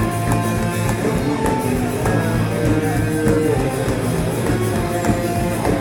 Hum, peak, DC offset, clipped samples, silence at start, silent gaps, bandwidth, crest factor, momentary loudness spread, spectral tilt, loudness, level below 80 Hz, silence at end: none; -4 dBFS; under 0.1%; under 0.1%; 0 s; none; 18.5 kHz; 14 dB; 3 LU; -6 dB/octave; -19 LUFS; -32 dBFS; 0 s